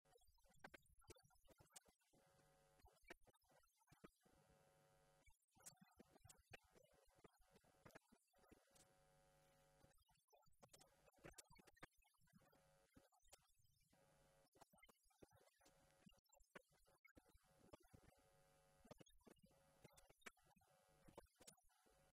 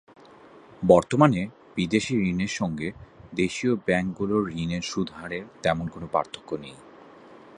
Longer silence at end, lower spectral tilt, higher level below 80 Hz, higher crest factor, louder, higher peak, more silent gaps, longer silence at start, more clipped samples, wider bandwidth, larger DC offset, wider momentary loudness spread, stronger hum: second, 0.05 s vs 0.2 s; second, -3 dB/octave vs -6 dB/octave; second, -84 dBFS vs -52 dBFS; about the same, 28 dB vs 24 dB; second, -68 LUFS vs -26 LUFS; second, -44 dBFS vs -2 dBFS; first, 5.44-5.48 s, 10.24-10.28 s, 14.48-14.52 s, 16.19-16.24 s, 16.99-17.04 s, 17.11-17.15 s vs none; second, 0.05 s vs 0.8 s; neither; first, 15.5 kHz vs 11 kHz; neither; second, 4 LU vs 15 LU; neither